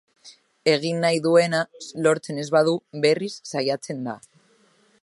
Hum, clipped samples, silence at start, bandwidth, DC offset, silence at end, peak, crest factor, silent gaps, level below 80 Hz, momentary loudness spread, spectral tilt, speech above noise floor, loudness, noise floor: none; under 0.1%; 0.25 s; 11.5 kHz; under 0.1%; 0.85 s; -4 dBFS; 20 dB; none; -74 dBFS; 13 LU; -5 dB/octave; 38 dB; -23 LUFS; -60 dBFS